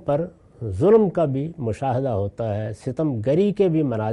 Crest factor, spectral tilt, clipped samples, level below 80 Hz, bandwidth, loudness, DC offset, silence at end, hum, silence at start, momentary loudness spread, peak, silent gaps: 16 dB; -9 dB/octave; under 0.1%; -54 dBFS; 11 kHz; -22 LUFS; under 0.1%; 0 s; none; 0 s; 11 LU; -6 dBFS; none